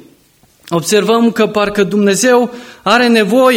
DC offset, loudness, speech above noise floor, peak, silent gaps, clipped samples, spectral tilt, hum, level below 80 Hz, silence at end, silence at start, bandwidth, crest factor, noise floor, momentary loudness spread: under 0.1%; -12 LUFS; 39 dB; 0 dBFS; none; under 0.1%; -4 dB/octave; none; -52 dBFS; 0 s; 0.7 s; 17 kHz; 12 dB; -50 dBFS; 9 LU